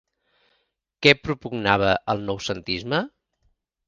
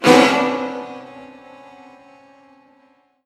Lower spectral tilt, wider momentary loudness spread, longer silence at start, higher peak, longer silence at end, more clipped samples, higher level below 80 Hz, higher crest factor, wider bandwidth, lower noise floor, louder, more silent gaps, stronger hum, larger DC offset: about the same, -5 dB/octave vs -4 dB/octave; second, 11 LU vs 28 LU; first, 1 s vs 0 s; about the same, 0 dBFS vs 0 dBFS; second, 0.8 s vs 2 s; neither; first, -52 dBFS vs -64 dBFS; about the same, 24 dB vs 20 dB; second, 9.6 kHz vs 15 kHz; first, -72 dBFS vs -57 dBFS; second, -22 LUFS vs -16 LUFS; neither; neither; neither